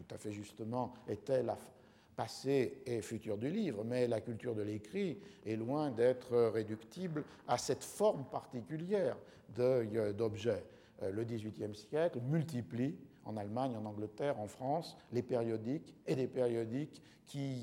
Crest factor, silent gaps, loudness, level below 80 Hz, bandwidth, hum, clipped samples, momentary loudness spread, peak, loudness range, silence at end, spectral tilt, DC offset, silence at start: 18 dB; none; -39 LUFS; -76 dBFS; 16.5 kHz; none; under 0.1%; 11 LU; -20 dBFS; 3 LU; 0 s; -6.5 dB/octave; under 0.1%; 0 s